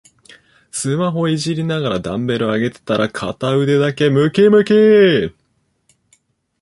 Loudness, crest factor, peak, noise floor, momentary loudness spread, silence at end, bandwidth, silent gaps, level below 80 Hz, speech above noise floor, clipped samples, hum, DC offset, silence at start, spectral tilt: -15 LUFS; 14 dB; -2 dBFS; -64 dBFS; 10 LU; 1.3 s; 11.5 kHz; none; -52 dBFS; 50 dB; under 0.1%; none; under 0.1%; 0.75 s; -6 dB/octave